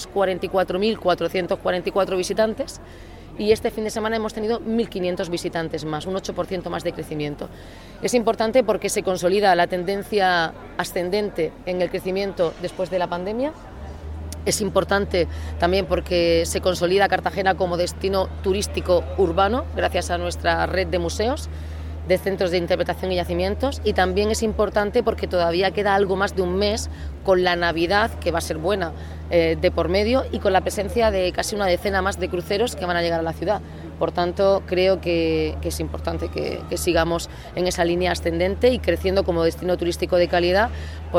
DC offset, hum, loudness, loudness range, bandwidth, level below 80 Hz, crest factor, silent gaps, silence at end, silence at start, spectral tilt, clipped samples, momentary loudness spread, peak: under 0.1%; none; -22 LUFS; 4 LU; 17.5 kHz; -38 dBFS; 16 dB; none; 0 s; 0 s; -5 dB/octave; under 0.1%; 8 LU; -6 dBFS